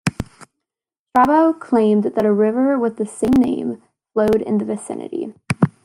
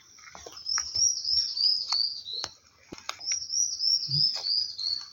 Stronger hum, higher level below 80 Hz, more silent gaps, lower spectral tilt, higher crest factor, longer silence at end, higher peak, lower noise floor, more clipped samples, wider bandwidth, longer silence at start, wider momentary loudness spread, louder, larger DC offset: neither; first, -48 dBFS vs -64 dBFS; first, 0.99-1.06 s vs none; first, -7 dB/octave vs 0.5 dB/octave; about the same, 16 dB vs 20 dB; first, 0.15 s vs 0 s; first, -2 dBFS vs -10 dBFS; first, -87 dBFS vs -50 dBFS; neither; second, 15 kHz vs 17 kHz; second, 0.05 s vs 0.2 s; second, 13 LU vs 16 LU; first, -18 LUFS vs -25 LUFS; neither